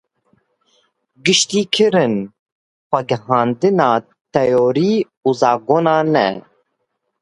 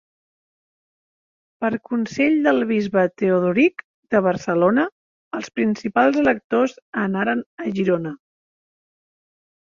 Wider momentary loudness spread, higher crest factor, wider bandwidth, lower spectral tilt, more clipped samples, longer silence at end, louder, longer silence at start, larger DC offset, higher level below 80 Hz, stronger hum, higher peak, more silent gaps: about the same, 7 LU vs 9 LU; about the same, 18 dB vs 18 dB; first, 11.5 kHz vs 7.4 kHz; second, -4.5 dB/octave vs -7 dB/octave; neither; second, 0.8 s vs 1.5 s; first, -16 LUFS vs -20 LUFS; second, 1.25 s vs 1.6 s; neither; about the same, -60 dBFS vs -62 dBFS; neither; about the same, 0 dBFS vs -2 dBFS; second, 2.39-2.46 s, 2.52-2.90 s, 4.21-4.25 s, 5.17-5.23 s vs 3.84-4.03 s, 4.92-5.31 s, 6.44-6.50 s, 6.82-6.93 s, 7.46-7.57 s